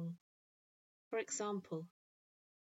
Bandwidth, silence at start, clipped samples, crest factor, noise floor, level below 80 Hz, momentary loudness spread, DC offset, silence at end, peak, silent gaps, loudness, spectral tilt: 8.2 kHz; 0 s; under 0.1%; 18 dB; under -90 dBFS; under -90 dBFS; 15 LU; under 0.1%; 0.9 s; -30 dBFS; 0.21-1.11 s; -43 LUFS; -4.5 dB/octave